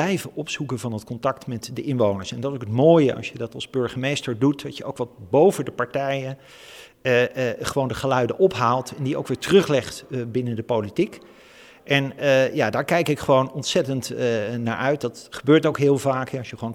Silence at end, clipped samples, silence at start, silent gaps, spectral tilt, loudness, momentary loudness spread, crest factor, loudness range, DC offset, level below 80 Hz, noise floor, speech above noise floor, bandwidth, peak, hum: 0 s; under 0.1%; 0 s; none; -5.5 dB/octave; -22 LUFS; 12 LU; 20 dB; 2 LU; under 0.1%; -56 dBFS; -48 dBFS; 26 dB; 17.5 kHz; -2 dBFS; none